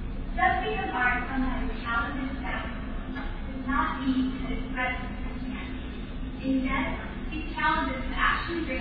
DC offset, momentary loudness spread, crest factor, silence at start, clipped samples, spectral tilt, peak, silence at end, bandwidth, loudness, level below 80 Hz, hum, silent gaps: under 0.1%; 10 LU; 20 dB; 0 s; under 0.1%; -9 dB/octave; -10 dBFS; 0 s; 4.9 kHz; -29 LUFS; -36 dBFS; none; none